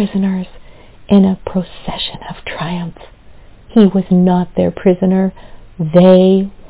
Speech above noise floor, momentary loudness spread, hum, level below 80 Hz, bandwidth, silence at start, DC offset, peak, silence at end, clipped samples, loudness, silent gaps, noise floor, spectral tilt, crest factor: 26 dB; 15 LU; none; -40 dBFS; 4 kHz; 0 s; under 0.1%; 0 dBFS; 0 s; 0.6%; -13 LUFS; none; -38 dBFS; -12 dB/octave; 14 dB